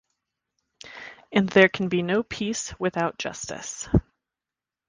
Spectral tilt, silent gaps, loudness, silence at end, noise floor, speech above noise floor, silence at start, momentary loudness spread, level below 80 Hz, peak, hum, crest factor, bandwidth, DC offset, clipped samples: -5 dB/octave; none; -24 LUFS; 0.9 s; -89 dBFS; 66 dB; 0.85 s; 20 LU; -46 dBFS; -2 dBFS; none; 24 dB; 10 kHz; under 0.1%; under 0.1%